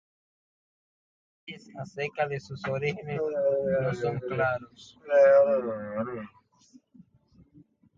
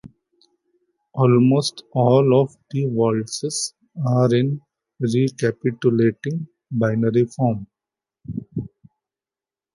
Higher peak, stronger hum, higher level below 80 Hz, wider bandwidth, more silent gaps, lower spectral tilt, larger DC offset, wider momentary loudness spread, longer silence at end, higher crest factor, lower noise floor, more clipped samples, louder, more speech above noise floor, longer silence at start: second, -10 dBFS vs -4 dBFS; neither; second, -64 dBFS vs -58 dBFS; second, 7.4 kHz vs 11.5 kHz; neither; about the same, -7 dB/octave vs -6.5 dB/octave; neither; first, 23 LU vs 15 LU; first, 1.7 s vs 1.05 s; about the same, 18 dB vs 18 dB; second, -61 dBFS vs under -90 dBFS; neither; second, -27 LUFS vs -20 LUFS; second, 34 dB vs over 71 dB; first, 1.45 s vs 0.05 s